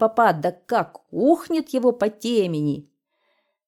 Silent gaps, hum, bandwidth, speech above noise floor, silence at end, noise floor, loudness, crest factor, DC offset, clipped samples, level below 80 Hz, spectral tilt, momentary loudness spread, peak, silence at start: none; none; 16.5 kHz; 49 dB; 0.85 s; -70 dBFS; -22 LUFS; 18 dB; under 0.1%; under 0.1%; -68 dBFS; -6.5 dB/octave; 7 LU; -6 dBFS; 0 s